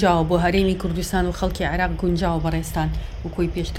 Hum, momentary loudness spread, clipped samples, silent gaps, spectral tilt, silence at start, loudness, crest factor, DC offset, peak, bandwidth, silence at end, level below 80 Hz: none; 7 LU; under 0.1%; none; -6 dB/octave; 0 s; -22 LUFS; 16 dB; under 0.1%; -6 dBFS; 16 kHz; 0 s; -30 dBFS